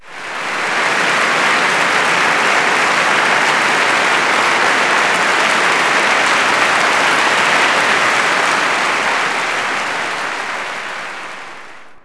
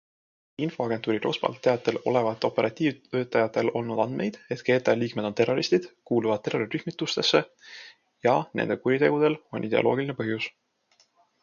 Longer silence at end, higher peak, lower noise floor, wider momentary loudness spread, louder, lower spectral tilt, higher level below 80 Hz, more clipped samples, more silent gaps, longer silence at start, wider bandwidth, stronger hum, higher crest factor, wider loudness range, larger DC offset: second, 0.05 s vs 0.9 s; first, 0 dBFS vs -6 dBFS; second, -37 dBFS vs -66 dBFS; about the same, 10 LU vs 9 LU; first, -13 LUFS vs -26 LUFS; second, -1 dB/octave vs -5.5 dB/octave; first, -60 dBFS vs -70 dBFS; neither; neither; second, 0.05 s vs 0.6 s; first, 11 kHz vs 7.2 kHz; neither; second, 14 dB vs 22 dB; first, 4 LU vs 1 LU; neither